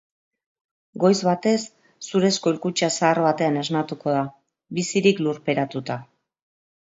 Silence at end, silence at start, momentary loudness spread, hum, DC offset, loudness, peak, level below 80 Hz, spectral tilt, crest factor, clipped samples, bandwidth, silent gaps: 0.8 s; 0.95 s; 13 LU; none; under 0.1%; -22 LUFS; -4 dBFS; -68 dBFS; -5 dB/octave; 20 dB; under 0.1%; 8 kHz; none